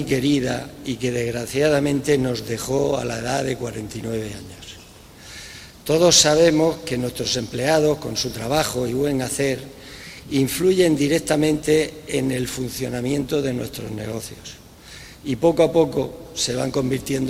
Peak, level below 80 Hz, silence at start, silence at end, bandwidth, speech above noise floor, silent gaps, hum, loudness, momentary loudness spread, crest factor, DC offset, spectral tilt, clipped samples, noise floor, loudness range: 0 dBFS; -46 dBFS; 0 s; 0 s; 16 kHz; 23 dB; none; none; -21 LUFS; 19 LU; 20 dB; under 0.1%; -4 dB/octave; under 0.1%; -44 dBFS; 7 LU